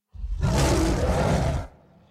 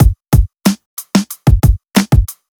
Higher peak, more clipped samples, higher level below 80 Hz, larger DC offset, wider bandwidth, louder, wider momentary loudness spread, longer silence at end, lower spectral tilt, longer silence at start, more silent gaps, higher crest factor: second, -10 dBFS vs 0 dBFS; neither; second, -30 dBFS vs -16 dBFS; neither; second, 15 kHz vs 18.5 kHz; second, -24 LUFS vs -14 LUFS; first, 12 LU vs 5 LU; first, 0.4 s vs 0.25 s; about the same, -5.5 dB/octave vs -6 dB/octave; first, 0.15 s vs 0 s; second, none vs 0.86-0.97 s; about the same, 14 dB vs 12 dB